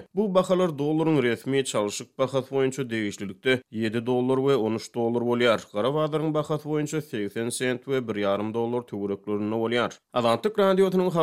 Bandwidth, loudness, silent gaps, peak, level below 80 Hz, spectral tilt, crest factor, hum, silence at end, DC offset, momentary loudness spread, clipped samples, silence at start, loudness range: 16 kHz; -26 LUFS; none; -8 dBFS; -70 dBFS; -5.5 dB/octave; 18 dB; none; 0 s; under 0.1%; 7 LU; under 0.1%; 0 s; 3 LU